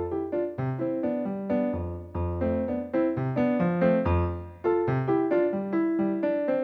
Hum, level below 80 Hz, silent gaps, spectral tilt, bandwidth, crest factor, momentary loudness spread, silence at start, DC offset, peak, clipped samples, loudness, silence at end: none; -46 dBFS; none; -11 dB/octave; 4.8 kHz; 14 dB; 7 LU; 0 s; under 0.1%; -12 dBFS; under 0.1%; -27 LUFS; 0 s